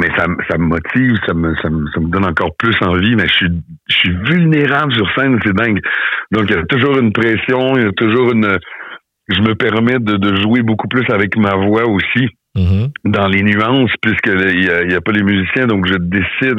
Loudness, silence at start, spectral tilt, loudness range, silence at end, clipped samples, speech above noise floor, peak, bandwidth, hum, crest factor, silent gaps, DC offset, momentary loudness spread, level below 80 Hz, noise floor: -13 LUFS; 0 s; -8 dB/octave; 1 LU; 0 s; under 0.1%; 20 dB; -2 dBFS; 6.8 kHz; none; 10 dB; none; under 0.1%; 4 LU; -38 dBFS; -33 dBFS